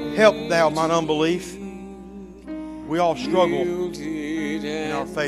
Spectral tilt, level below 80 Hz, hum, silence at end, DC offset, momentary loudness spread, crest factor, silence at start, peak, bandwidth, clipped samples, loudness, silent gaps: -5 dB/octave; -50 dBFS; none; 0 s; under 0.1%; 18 LU; 20 dB; 0 s; -2 dBFS; 14.5 kHz; under 0.1%; -22 LUFS; none